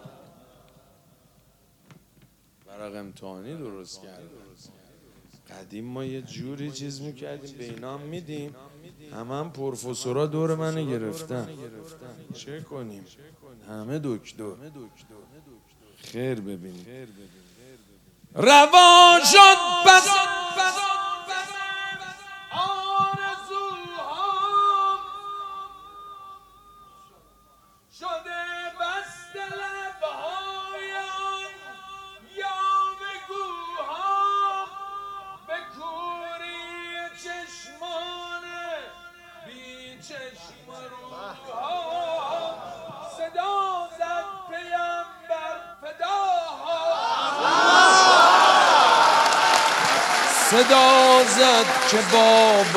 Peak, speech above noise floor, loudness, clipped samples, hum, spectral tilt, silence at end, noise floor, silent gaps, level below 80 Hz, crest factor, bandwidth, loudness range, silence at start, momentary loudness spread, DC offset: 0 dBFS; 39 dB; -19 LUFS; under 0.1%; none; -2 dB/octave; 0 s; -60 dBFS; none; -66 dBFS; 22 dB; 16.5 kHz; 23 LU; 2.7 s; 26 LU; under 0.1%